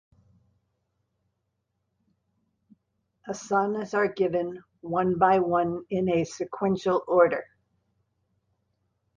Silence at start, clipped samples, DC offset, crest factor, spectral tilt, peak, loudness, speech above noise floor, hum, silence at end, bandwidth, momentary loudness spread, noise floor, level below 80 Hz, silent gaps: 3.25 s; under 0.1%; under 0.1%; 22 dB; -6.5 dB/octave; -6 dBFS; -26 LUFS; 54 dB; none; 1.75 s; 9.4 kHz; 13 LU; -79 dBFS; -64 dBFS; none